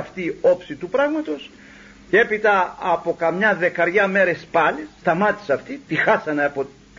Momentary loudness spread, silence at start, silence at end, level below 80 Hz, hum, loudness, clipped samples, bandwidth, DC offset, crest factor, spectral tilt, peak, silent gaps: 8 LU; 0 s; 0.3 s; -56 dBFS; none; -20 LUFS; under 0.1%; 7.6 kHz; under 0.1%; 16 dB; -6 dB/octave; -4 dBFS; none